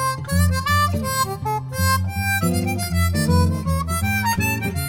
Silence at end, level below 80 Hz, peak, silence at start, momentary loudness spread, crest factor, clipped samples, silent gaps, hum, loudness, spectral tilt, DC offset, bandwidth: 0 s; -34 dBFS; -6 dBFS; 0 s; 4 LU; 14 dB; under 0.1%; none; none; -20 LUFS; -5 dB/octave; under 0.1%; 17 kHz